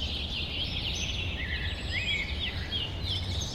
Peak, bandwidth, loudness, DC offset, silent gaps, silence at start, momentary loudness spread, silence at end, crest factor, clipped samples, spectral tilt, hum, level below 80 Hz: -18 dBFS; 14.5 kHz; -31 LUFS; under 0.1%; none; 0 s; 3 LU; 0 s; 14 dB; under 0.1%; -3.5 dB/octave; none; -38 dBFS